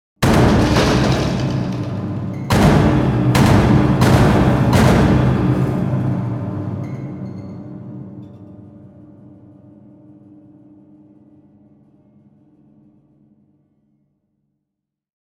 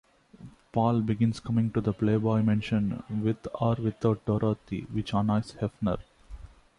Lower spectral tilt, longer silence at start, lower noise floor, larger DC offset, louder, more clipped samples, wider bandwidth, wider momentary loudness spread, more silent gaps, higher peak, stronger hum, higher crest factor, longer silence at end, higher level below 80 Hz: second, -7 dB/octave vs -8.5 dB/octave; second, 0.2 s vs 0.4 s; first, -79 dBFS vs -50 dBFS; neither; first, -15 LUFS vs -28 LUFS; neither; first, 15.5 kHz vs 10.5 kHz; first, 20 LU vs 7 LU; neither; first, 0 dBFS vs -12 dBFS; neither; about the same, 16 dB vs 16 dB; first, 6.55 s vs 0.35 s; first, -30 dBFS vs -52 dBFS